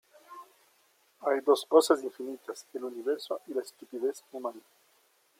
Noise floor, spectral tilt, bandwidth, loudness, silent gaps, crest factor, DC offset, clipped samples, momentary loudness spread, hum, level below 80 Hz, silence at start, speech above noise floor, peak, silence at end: -68 dBFS; -2.5 dB/octave; 16.5 kHz; -30 LUFS; none; 22 dB; under 0.1%; under 0.1%; 20 LU; none; under -90 dBFS; 0.3 s; 38 dB; -8 dBFS; 0.8 s